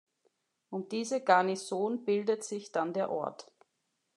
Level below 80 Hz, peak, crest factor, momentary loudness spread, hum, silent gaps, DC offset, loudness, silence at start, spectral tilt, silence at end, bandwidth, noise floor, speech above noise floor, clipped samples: under -90 dBFS; -10 dBFS; 24 dB; 14 LU; none; none; under 0.1%; -32 LUFS; 0.7 s; -4.5 dB/octave; 0.75 s; 12 kHz; -81 dBFS; 49 dB; under 0.1%